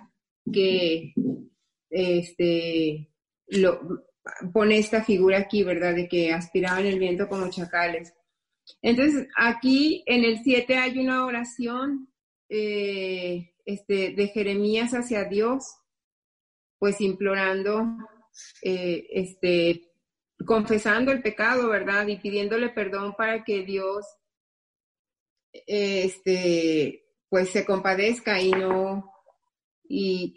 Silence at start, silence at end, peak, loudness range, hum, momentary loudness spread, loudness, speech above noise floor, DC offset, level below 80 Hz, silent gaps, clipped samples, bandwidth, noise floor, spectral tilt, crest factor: 0.45 s; 0.05 s; -8 dBFS; 5 LU; none; 10 LU; -25 LUFS; 51 dB; under 0.1%; -62 dBFS; 12.23-12.49 s, 16.04-16.80 s, 24.37-25.05 s, 25.20-25.36 s, 25.43-25.53 s, 29.64-29.82 s; under 0.1%; 11 kHz; -76 dBFS; -5 dB/octave; 18 dB